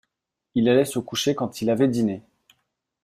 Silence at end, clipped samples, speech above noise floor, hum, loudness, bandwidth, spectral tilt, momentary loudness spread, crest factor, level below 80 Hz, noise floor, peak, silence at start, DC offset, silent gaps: 0.85 s; under 0.1%; 61 dB; none; -23 LUFS; 15.5 kHz; -5.5 dB/octave; 8 LU; 18 dB; -64 dBFS; -82 dBFS; -6 dBFS; 0.55 s; under 0.1%; none